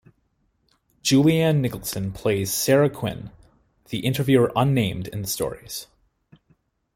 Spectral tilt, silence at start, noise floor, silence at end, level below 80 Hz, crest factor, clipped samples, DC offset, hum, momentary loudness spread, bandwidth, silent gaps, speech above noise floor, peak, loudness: -5.5 dB/octave; 1.05 s; -68 dBFS; 1.1 s; -52 dBFS; 20 dB; under 0.1%; under 0.1%; none; 15 LU; 16.5 kHz; none; 47 dB; -4 dBFS; -22 LUFS